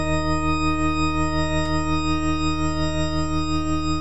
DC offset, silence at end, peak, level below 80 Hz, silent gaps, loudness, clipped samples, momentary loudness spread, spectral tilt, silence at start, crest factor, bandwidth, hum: 4%; 0 s; -10 dBFS; -30 dBFS; none; -23 LUFS; under 0.1%; 2 LU; -5.5 dB/octave; 0 s; 12 dB; 10.5 kHz; none